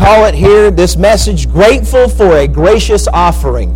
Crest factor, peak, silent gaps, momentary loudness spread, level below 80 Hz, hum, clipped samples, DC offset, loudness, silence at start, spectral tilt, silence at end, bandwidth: 6 dB; 0 dBFS; none; 4 LU; -14 dBFS; none; 0.1%; under 0.1%; -8 LUFS; 0 s; -5.5 dB/octave; 0 s; 16.5 kHz